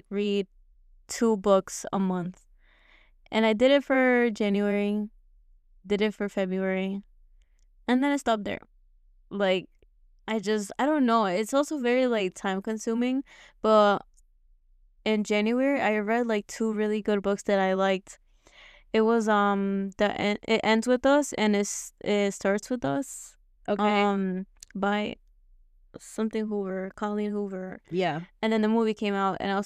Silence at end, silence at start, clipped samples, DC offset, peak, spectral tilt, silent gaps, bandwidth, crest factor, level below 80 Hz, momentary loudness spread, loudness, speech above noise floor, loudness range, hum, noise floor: 0 s; 0.1 s; under 0.1%; under 0.1%; -8 dBFS; -5 dB/octave; none; 14 kHz; 18 dB; -60 dBFS; 11 LU; -26 LUFS; 35 dB; 5 LU; none; -61 dBFS